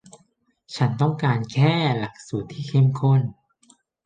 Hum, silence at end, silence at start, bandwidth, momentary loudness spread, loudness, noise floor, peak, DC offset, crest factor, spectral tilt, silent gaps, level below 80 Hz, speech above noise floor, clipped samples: none; 0.75 s; 0.7 s; 9 kHz; 12 LU; -22 LUFS; -64 dBFS; -6 dBFS; under 0.1%; 16 dB; -7.5 dB/octave; none; -60 dBFS; 43 dB; under 0.1%